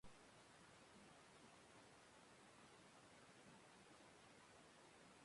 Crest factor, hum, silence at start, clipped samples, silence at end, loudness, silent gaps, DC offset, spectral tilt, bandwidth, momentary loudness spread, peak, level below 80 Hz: 16 dB; none; 0.05 s; under 0.1%; 0 s; -67 LUFS; none; under 0.1%; -3 dB/octave; 11.5 kHz; 1 LU; -50 dBFS; -86 dBFS